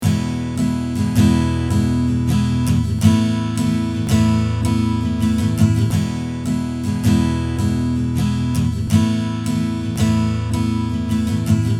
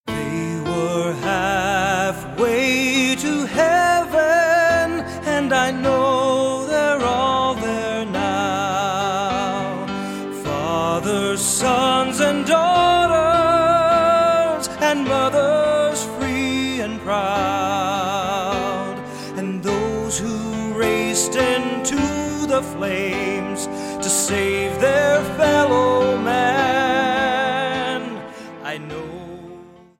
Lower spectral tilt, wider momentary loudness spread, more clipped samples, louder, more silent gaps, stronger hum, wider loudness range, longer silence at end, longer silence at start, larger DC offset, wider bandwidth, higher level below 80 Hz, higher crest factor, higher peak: first, -6.5 dB/octave vs -3.5 dB/octave; second, 5 LU vs 10 LU; neither; about the same, -18 LUFS vs -19 LUFS; neither; neither; second, 2 LU vs 6 LU; second, 0 s vs 0.3 s; about the same, 0 s vs 0.05 s; neither; about the same, 15.5 kHz vs 16.5 kHz; first, -32 dBFS vs -46 dBFS; about the same, 16 dB vs 16 dB; first, 0 dBFS vs -4 dBFS